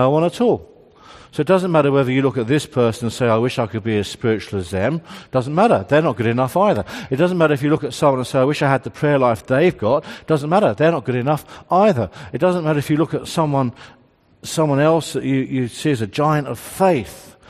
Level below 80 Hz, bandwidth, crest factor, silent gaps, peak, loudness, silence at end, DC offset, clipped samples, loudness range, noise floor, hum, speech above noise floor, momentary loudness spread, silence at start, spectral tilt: -54 dBFS; 14.5 kHz; 18 dB; none; 0 dBFS; -18 LUFS; 0.2 s; under 0.1%; under 0.1%; 3 LU; -44 dBFS; none; 27 dB; 7 LU; 0 s; -6.5 dB/octave